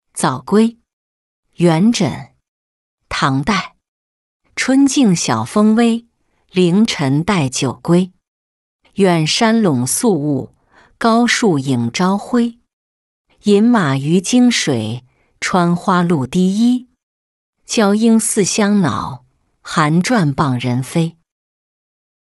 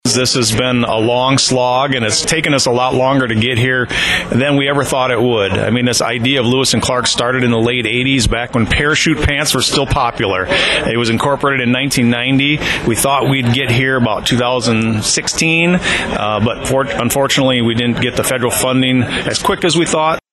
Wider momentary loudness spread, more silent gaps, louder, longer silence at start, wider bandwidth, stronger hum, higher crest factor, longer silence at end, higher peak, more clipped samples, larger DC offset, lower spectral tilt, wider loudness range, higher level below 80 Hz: first, 10 LU vs 3 LU; first, 0.93-1.43 s, 2.48-2.98 s, 3.88-4.40 s, 8.28-8.79 s, 12.73-13.25 s, 17.03-17.53 s vs none; about the same, -15 LUFS vs -13 LUFS; about the same, 0.15 s vs 0.05 s; about the same, 12 kHz vs 13 kHz; neither; about the same, 14 dB vs 10 dB; first, 1.1 s vs 0.15 s; about the same, -2 dBFS vs -2 dBFS; neither; neither; about the same, -5 dB/octave vs -4 dB/octave; about the same, 3 LU vs 1 LU; second, -50 dBFS vs -34 dBFS